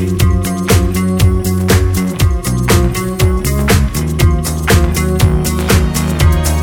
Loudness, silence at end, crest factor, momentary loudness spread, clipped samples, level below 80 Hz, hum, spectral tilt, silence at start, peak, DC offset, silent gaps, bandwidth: -13 LUFS; 0 s; 12 dB; 3 LU; under 0.1%; -18 dBFS; none; -5.5 dB/octave; 0 s; 0 dBFS; under 0.1%; none; 19 kHz